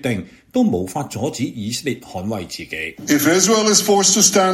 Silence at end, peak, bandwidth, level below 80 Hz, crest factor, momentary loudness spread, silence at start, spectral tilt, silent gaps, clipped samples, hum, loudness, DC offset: 0 s; 0 dBFS; 16.5 kHz; -54 dBFS; 18 dB; 14 LU; 0.05 s; -3 dB/octave; none; under 0.1%; none; -17 LUFS; under 0.1%